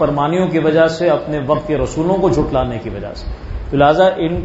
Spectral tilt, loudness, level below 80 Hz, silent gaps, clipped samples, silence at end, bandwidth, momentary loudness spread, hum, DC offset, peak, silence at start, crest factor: -7 dB/octave; -15 LUFS; -30 dBFS; none; under 0.1%; 0 s; 8 kHz; 14 LU; none; under 0.1%; 0 dBFS; 0 s; 16 dB